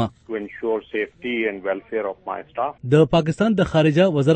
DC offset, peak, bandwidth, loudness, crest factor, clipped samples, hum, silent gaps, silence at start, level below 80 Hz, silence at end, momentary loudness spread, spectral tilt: under 0.1%; -4 dBFS; 8.8 kHz; -21 LUFS; 16 dB; under 0.1%; none; none; 0 s; -48 dBFS; 0 s; 12 LU; -7.5 dB/octave